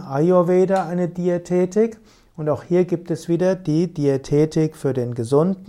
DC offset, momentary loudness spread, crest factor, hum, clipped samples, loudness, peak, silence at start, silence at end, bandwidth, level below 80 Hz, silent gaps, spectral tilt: under 0.1%; 7 LU; 14 dB; none; under 0.1%; -20 LUFS; -4 dBFS; 0 s; 0.05 s; 12 kHz; -52 dBFS; none; -8 dB/octave